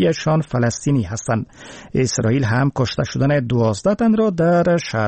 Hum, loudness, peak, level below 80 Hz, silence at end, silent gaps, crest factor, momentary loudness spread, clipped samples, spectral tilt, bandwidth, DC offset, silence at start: none; -18 LUFS; -6 dBFS; -46 dBFS; 0 s; none; 12 dB; 7 LU; under 0.1%; -6 dB/octave; 8.8 kHz; under 0.1%; 0 s